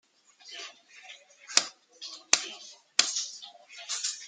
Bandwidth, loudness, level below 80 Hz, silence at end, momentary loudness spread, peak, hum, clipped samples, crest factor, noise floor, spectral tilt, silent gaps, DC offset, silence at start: 12.5 kHz; -28 LUFS; -80 dBFS; 0 s; 22 LU; 0 dBFS; none; under 0.1%; 34 dB; -54 dBFS; 3 dB/octave; none; under 0.1%; 0.45 s